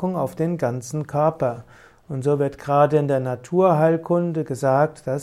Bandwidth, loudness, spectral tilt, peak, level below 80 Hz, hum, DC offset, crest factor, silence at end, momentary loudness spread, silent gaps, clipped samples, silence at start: 14 kHz; -21 LUFS; -8 dB/octave; -4 dBFS; -58 dBFS; none; under 0.1%; 16 dB; 0 s; 9 LU; none; under 0.1%; 0 s